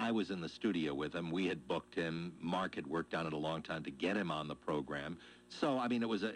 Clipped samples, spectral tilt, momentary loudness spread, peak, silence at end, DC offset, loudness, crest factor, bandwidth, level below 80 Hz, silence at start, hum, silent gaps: under 0.1%; -6 dB/octave; 7 LU; -22 dBFS; 0 s; under 0.1%; -39 LUFS; 18 dB; 11 kHz; -68 dBFS; 0 s; none; none